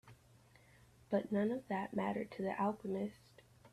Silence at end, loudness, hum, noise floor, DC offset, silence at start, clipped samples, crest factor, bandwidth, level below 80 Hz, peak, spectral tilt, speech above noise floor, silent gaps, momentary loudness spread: 0.05 s; -39 LUFS; none; -66 dBFS; under 0.1%; 0.05 s; under 0.1%; 18 dB; 13 kHz; -74 dBFS; -22 dBFS; -8 dB/octave; 27 dB; none; 5 LU